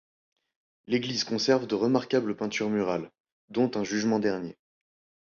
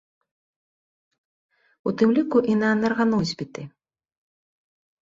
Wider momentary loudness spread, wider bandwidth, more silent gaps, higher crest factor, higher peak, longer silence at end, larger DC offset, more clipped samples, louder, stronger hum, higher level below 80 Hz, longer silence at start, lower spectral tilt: second, 9 LU vs 15 LU; about the same, 7.2 kHz vs 7.6 kHz; first, 3.20-3.24 s, 3.32-3.48 s vs none; about the same, 20 dB vs 18 dB; about the same, -10 dBFS vs -8 dBFS; second, 0.75 s vs 1.35 s; neither; neither; second, -28 LUFS vs -22 LUFS; neither; about the same, -68 dBFS vs -64 dBFS; second, 0.9 s vs 1.85 s; second, -5 dB/octave vs -6.5 dB/octave